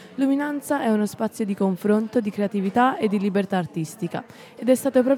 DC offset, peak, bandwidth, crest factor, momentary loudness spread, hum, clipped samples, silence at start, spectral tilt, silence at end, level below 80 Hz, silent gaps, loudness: under 0.1%; -6 dBFS; 16.5 kHz; 16 dB; 9 LU; none; under 0.1%; 0 s; -6.5 dB/octave; 0 s; -72 dBFS; none; -23 LUFS